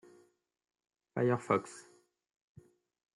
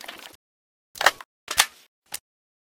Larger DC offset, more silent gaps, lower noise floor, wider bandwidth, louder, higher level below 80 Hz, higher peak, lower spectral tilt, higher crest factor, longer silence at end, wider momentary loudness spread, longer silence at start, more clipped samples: neither; second, none vs 0.35-0.95 s, 1.25-1.47 s, 1.88-2.02 s; second, -65 dBFS vs under -90 dBFS; second, 11.5 kHz vs 18 kHz; second, -34 LUFS vs -23 LUFS; second, -82 dBFS vs -62 dBFS; second, -16 dBFS vs 0 dBFS; first, -7 dB/octave vs 1.5 dB/octave; second, 22 dB vs 30 dB; first, 1.35 s vs 0.45 s; about the same, 20 LU vs 21 LU; first, 1.15 s vs 0.1 s; neither